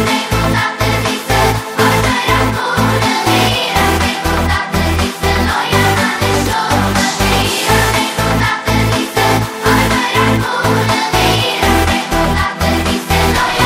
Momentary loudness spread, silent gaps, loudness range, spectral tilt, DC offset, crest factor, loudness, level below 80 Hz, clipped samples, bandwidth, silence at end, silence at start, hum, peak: 3 LU; none; 1 LU; -4 dB/octave; under 0.1%; 12 dB; -13 LUFS; -24 dBFS; under 0.1%; 16.5 kHz; 0 s; 0 s; none; 0 dBFS